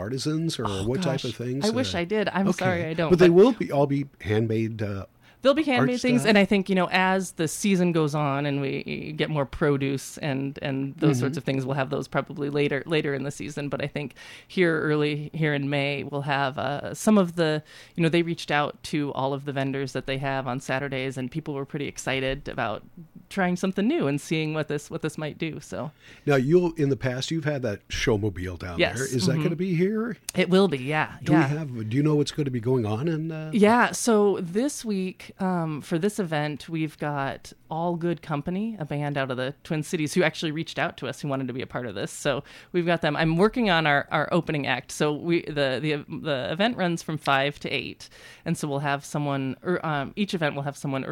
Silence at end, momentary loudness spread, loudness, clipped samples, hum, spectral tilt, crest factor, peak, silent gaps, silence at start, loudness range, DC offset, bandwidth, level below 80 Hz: 0 s; 10 LU; -25 LUFS; under 0.1%; none; -5.5 dB/octave; 18 dB; -8 dBFS; none; 0 s; 6 LU; under 0.1%; 16.5 kHz; -54 dBFS